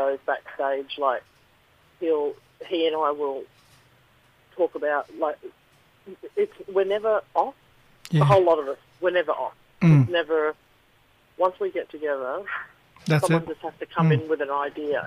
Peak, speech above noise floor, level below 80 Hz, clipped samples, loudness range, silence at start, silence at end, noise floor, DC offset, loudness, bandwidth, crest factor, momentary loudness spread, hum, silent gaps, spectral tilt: -8 dBFS; 36 dB; -62 dBFS; under 0.1%; 7 LU; 0 s; 0 s; -60 dBFS; under 0.1%; -25 LUFS; 13.5 kHz; 16 dB; 15 LU; none; none; -7 dB/octave